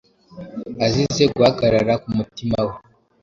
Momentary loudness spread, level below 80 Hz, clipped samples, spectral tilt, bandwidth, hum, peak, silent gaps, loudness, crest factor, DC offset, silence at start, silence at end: 18 LU; -46 dBFS; under 0.1%; -5.5 dB/octave; 7.6 kHz; none; -2 dBFS; none; -19 LUFS; 18 dB; under 0.1%; 0.3 s; 0.45 s